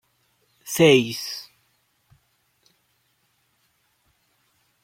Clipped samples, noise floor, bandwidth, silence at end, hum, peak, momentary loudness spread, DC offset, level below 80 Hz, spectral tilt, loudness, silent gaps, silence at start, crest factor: under 0.1%; -68 dBFS; 16.5 kHz; 3.4 s; none; -4 dBFS; 20 LU; under 0.1%; -68 dBFS; -4.5 dB/octave; -20 LUFS; none; 0.65 s; 24 dB